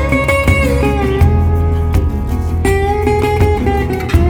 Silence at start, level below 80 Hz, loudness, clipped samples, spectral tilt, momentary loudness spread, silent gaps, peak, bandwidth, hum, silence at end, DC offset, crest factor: 0 s; -18 dBFS; -14 LUFS; under 0.1%; -7 dB/octave; 4 LU; none; 0 dBFS; 17 kHz; none; 0 s; under 0.1%; 12 dB